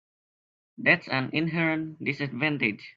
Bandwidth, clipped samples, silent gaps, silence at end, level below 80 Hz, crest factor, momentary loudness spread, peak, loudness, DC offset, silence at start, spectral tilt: 7.2 kHz; under 0.1%; none; 0.05 s; -68 dBFS; 24 dB; 7 LU; -4 dBFS; -26 LUFS; under 0.1%; 0.8 s; -7.5 dB/octave